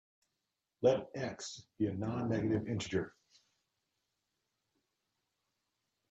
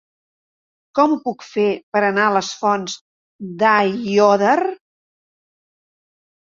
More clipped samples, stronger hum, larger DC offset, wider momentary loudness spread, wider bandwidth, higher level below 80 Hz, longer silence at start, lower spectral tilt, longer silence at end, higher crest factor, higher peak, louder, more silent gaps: neither; neither; neither; about the same, 12 LU vs 11 LU; first, 8.4 kHz vs 7.6 kHz; about the same, -70 dBFS vs -66 dBFS; second, 0.8 s vs 0.95 s; first, -6 dB/octave vs -4.5 dB/octave; first, 3 s vs 1.7 s; about the same, 22 dB vs 18 dB; second, -16 dBFS vs -2 dBFS; second, -36 LUFS vs -17 LUFS; second, none vs 1.83-1.92 s, 3.01-3.39 s